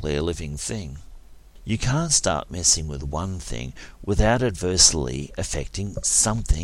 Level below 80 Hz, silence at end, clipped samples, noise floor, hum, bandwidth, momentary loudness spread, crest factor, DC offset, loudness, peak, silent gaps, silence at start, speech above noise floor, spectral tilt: -32 dBFS; 0 s; under 0.1%; -44 dBFS; none; 16 kHz; 17 LU; 24 dB; under 0.1%; -22 LUFS; 0 dBFS; none; 0 s; 21 dB; -3 dB/octave